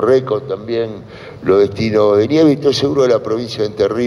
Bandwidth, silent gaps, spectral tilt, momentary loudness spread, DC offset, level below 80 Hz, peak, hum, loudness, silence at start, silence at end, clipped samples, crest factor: 11.5 kHz; none; -6.5 dB/octave; 10 LU; under 0.1%; -50 dBFS; -2 dBFS; none; -15 LUFS; 0 s; 0 s; under 0.1%; 12 dB